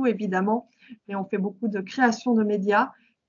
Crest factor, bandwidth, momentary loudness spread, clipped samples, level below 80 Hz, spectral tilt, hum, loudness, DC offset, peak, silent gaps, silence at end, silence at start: 18 dB; 7.4 kHz; 8 LU; under 0.1%; -76 dBFS; -6.5 dB/octave; none; -25 LUFS; under 0.1%; -6 dBFS; none; 0.35 s; 0 s